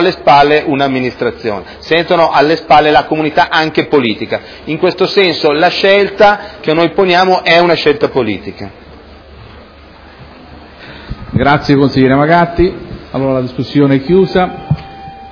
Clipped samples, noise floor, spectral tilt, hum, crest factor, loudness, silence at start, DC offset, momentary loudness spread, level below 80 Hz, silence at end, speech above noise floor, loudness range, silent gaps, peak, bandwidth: 0.5%; -36 dBFS; -7 dB/octave; none; 12 dB; -11 LUFS; 0 s; under 0.1%; 14 LU; -36 dBFS; 0 s; 26 dB; 7 LU; none; 0 dBFS; 5.4 kHz